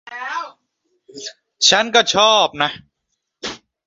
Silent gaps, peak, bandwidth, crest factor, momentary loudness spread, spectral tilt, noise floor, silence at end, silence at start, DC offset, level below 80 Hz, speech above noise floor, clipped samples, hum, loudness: none; 0 dBFS; 8 kHz; 20 dB; 20 LU; -1 dB/octave; -75 dBFS; 0.3 s; 0.1 s; under 0.1%; -60 dBFS; 59 dB; under 0.1%; none; -15 LUFS